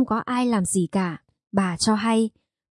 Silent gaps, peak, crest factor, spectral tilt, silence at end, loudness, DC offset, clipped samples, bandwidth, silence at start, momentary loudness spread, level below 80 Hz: none; -6 dBFS; 16 dB; -5 dB/octave; 0.4 s; -23 LUFS; under 0.1%; under 0.1%; 11.5 kHz; 0 s; 7 LU; -58 dBFS